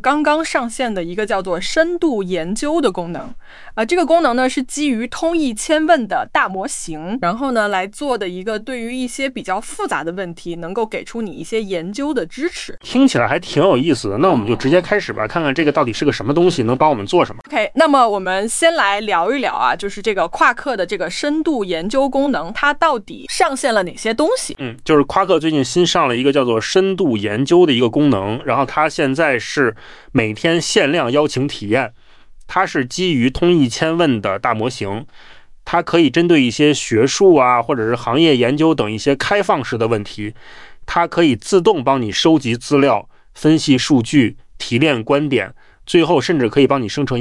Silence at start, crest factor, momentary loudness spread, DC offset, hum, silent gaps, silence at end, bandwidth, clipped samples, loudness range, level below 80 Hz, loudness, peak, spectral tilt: 0.05 s; 14 dB; 9 LU; under 0.1%; none; none; 0 s; 12 kHz; under 0.1%; 5 LU; -44 dBFS; -16 LUFS; -2 dBFS; -5 dB/octave